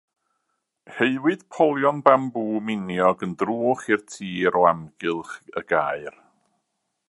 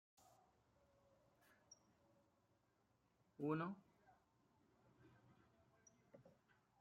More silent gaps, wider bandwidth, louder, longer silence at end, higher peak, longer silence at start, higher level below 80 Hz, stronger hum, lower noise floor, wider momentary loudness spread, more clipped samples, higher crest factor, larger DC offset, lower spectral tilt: neither; second, 11.5 kHz vs 13.5 kHz; first, -22 LUFS vs -47 LUFS; first, 1 s vs 0.55 s; first, 0 dBFS vs -32 dBFS; second, 0.9 s vs 1.7 s; first, -64 dBFS vs under -90 dBFS; neither; second, -77 dBFS vs -82 dBFS; second, 13 LU vs 24 LU; neither; about the same, 24 dB vs 26 dB; neither; about the same, -6 dB/octave vs -7 dB/octave